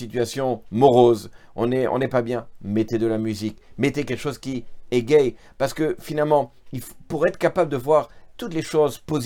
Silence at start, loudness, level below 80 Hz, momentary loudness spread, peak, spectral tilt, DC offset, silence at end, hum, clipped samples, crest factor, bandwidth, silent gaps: 0 s; -22 LUFS; -52 dBFS; 13 LU; -2 dBFS; -6.5 dB/octave; under 0.1%; 0 s; none; under 0.1%; 20 dB; 18 kHz; none